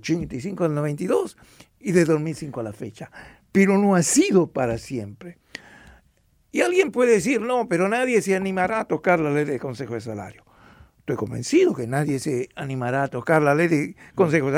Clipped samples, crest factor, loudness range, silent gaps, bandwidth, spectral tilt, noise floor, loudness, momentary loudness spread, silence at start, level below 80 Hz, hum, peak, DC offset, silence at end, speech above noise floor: under 0.1%; 16 dB; 4 LU; none; 16 kHz; -5.5 dB/octave; -62 dBFS; -22 LUFS; 16 LU; 0.05 s; -56 dBFS; none; -6 dBFS; under 0.1%; 0 s; 40 dB